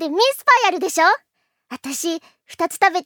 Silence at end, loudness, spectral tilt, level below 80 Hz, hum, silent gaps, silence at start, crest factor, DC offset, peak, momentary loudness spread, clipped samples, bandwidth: 0.05 s; -18 LUFS; 0 dB/octave; -74 dBFS; none; none; 0 s; 18 dB; under 0.1%; -2 dBFS; 15 LU; under 0.1%; over 20 kHz